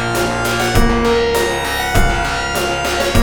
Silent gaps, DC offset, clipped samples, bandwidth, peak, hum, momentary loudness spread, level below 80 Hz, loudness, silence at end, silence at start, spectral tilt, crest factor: none; under 0.1%; under 0.1%; over 20 kHz; 0 dBFS; none; 3 LU; -22 dBFS; -16 LUFS; 0 s; 0 s; -4 dB/octave; 16 dB